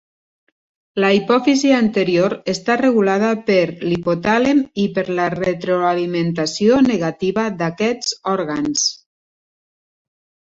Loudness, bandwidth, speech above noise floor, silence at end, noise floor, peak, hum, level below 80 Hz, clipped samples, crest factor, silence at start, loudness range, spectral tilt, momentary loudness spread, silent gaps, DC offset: -17 LUFS; 8 kHz; over 73 dB; 1.45 s; under -90 dBFS; -2 dBFS; none; -56 dBFS; under 0.1%; 16 dB; 0.95 s; 3 LU; -4.5 dB/octave; 6 LU; none; under 0.1%